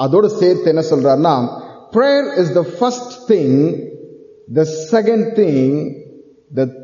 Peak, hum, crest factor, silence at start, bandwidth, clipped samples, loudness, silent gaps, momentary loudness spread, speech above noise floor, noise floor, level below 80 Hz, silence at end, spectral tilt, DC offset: -2 dBFS; none; 14 dB; 0 s; 7.4 kHz; under 0.1%; -15 LUFS; none; 13 LU; 27 dB; -41 dBFS; -62 dBFS; 0 s; -6.5 dB/octave; under 0.1%